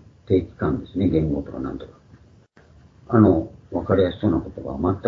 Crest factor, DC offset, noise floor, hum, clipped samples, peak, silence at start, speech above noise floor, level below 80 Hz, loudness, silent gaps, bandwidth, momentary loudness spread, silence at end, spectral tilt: 20 dB; under 0.1%; -52 dBFS; none; under 0.1%; -2 dBFS; 0.3 s; 31 dB; -42 dBFS; -22 LUFS; none; 5.4 kHz; 14 LU; 0 s; -10.5 dB/octave